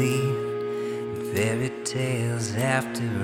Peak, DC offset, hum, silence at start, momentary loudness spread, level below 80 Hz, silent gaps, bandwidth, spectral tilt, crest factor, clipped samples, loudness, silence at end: -8 dBFS; under 0.1%; none; 0 s; 5 LU; -62 dBFS; none; 17.5 kHz; -5.5 dB/octave; 18 dB; under 0.1%; -27 LUFS; 0 s